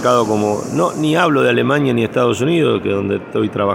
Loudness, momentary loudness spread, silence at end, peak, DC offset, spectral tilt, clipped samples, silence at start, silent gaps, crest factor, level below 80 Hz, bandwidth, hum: -16 LUFS; 5 LU; 0 s; 0 dBFS; under 0.1%; -6 dB/octave; under 0.1%; 0 s; none; 14 dB; -54 dBFS; 17.5 kHz; none